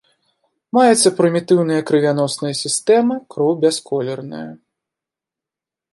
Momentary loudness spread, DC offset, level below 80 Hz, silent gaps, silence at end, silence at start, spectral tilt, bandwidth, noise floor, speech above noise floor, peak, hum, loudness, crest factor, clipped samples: 12 LU; under 0.1%; -70 dBFS; none; 1.4 s; 0.75 s; -4.5 dB/octave; 11.5 kHz; -87 dBFS; 71 dB; -2 dBFS; none; -16 LUFS; 16 dB; under 0.1%